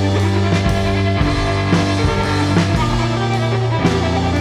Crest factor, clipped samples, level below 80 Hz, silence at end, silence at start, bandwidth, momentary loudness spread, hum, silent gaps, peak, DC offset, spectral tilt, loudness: 14 dB; under 0.1%; -28 dBFS; 0 s; 0 s; 11.5 kHz; 2 LU; none; none; -2 dBFS; under 0.1%; -6 dB/octave; -16 LUFS